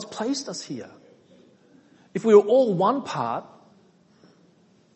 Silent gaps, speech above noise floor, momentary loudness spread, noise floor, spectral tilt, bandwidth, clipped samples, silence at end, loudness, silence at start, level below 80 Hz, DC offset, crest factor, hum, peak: none; 37 dB; 18 LU; -59 dBFS; -5.5 dB/octave; 8.4 kHz; under 0.1%; 1.5 s; -22 LUFS; 0 s; -74 dBFS; under 0.1%; 22 dB; none; -4 dBFS